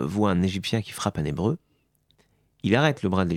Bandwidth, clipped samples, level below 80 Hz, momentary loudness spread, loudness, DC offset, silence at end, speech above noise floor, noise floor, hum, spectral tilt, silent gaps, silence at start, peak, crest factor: 14.5 kHz; under 0.1%; -52 dBFS; 7 LU; -25 LUFS; under 0.1%; 0 s; 43 dB; -67 dBFS; none; -6 dB/octave; none; 0 s; -4 dBFS; 22 dB